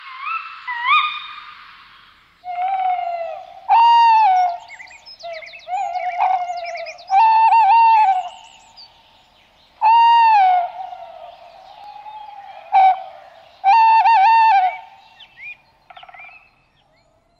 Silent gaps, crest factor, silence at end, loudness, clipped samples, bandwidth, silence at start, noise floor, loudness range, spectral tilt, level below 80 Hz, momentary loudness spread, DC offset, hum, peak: none; 12 dB; 1.15 s; -15 LUFS; under 0.1%; 7.6 kHz; 0.05 s; -58 dBFS; 5 LU; 0 dB/octave; -68 dBFS; 24 LU; under 0.1%; none; -6 dBFS